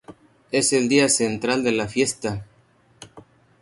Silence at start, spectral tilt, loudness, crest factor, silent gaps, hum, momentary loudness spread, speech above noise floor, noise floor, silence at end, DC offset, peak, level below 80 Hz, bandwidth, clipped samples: 0.1 s; -3 dB/octave; -21 LUFS; 18 dB; none; none; 11 LU; 37 dB; -58 dBFS; 0.4 s; under 0.1%; -4 dBFS; -56 dBFS; 12 kHz; under 0.1%